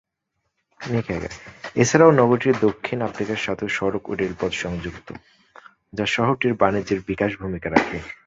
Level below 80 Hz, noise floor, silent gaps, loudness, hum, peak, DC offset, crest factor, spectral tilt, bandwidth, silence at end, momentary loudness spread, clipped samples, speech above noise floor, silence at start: -48 dBFS; -76 dBFS; none; -21 LUFS; none; -2 dBFS; under 0.1%; 20 dB; -5.5 dB/octave; 8 kHz; 0.1 s; 18 LU; under 0.1%; 55 dB; 0.8 s